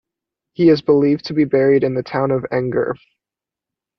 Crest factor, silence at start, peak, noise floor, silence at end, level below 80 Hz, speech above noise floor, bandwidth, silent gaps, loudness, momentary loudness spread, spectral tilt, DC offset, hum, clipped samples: 14 dB; 0.6 s; -4 dBFS; -88 dBFS; 1.05 s; -56 dBFS; 72 dB; 6.2 kHz; none; -17 LUFS; 8 LU; -8.5 dB/octave; under 0.1%; none; under 0.1%